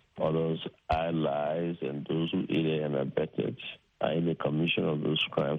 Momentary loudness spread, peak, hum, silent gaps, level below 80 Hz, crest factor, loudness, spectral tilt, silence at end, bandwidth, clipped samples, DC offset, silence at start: 6 LU; -14 dBFS; none; none; -54 dBFS; 18 dB; -30 LUFS; -8.5 dB/octave; 0 s; 5.2 kHz; under 0.1%; under 0.1%; 0.15 s